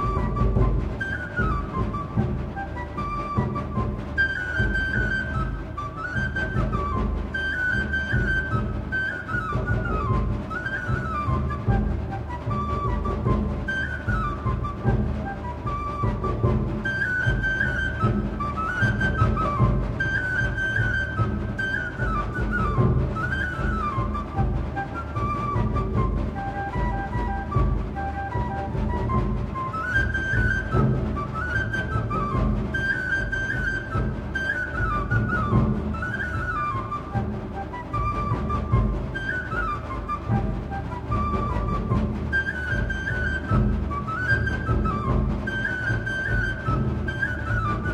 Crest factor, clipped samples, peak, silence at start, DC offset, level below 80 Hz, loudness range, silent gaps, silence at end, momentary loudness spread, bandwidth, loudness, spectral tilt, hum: 18 dB; under 0.1%; -6 dBFS; 0 s; under 0.1%; -30 dBFS; 3 LU; none; 0 s; 6 LU; 9.2 kHz; -26 LUFS; -7.5 dB/octave; none